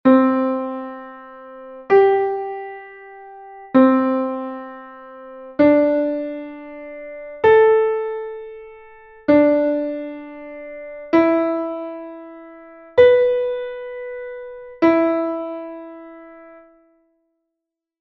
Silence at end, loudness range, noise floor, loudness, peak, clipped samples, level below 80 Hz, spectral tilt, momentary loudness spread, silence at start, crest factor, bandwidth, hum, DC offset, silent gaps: 1.6 s; 5 LU; -83 dBFS; -17 LUFS; -2 dBFS; under 0.1%; -58 dBFS; -8 dB/octave; 24 LU; 0.05 s; 18 dB; 5.8 kHz; none; under 0.1%; none